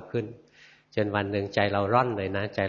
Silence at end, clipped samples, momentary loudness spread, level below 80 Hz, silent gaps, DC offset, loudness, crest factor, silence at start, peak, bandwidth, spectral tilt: 0 s; under 0.1%; 10 LU; -64 dBFS; none; under 0.1%; -27 LUFS; 20 dB; 0 s; -8 dBFS; 7.2 kHz; -7.5 dB/octave